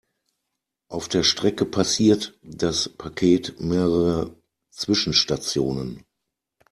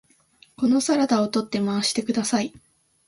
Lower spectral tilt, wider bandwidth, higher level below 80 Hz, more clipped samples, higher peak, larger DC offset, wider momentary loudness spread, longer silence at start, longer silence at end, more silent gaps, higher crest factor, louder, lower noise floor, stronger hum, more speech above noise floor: about the same, -4.5 dB/octave vs -4 dB/octave; first, 13.5 kHz vs 11.5 kHz; first, -50 dBFS vs -64 dBFS; neither; first, -4 dBFS vs -8 dBFS; neither; first, 12 LU vs 6 LU; first, 0.9 s vs 0.6 s; first, 0.75 s vs 0.6 s; neither; about the same, 20 dB vs 16 dB; about the same, -22 LUFS vs -23 LUFS; first, -82 dBFS vs -57 dBFS; neither; first, 60 dB vs 35 dB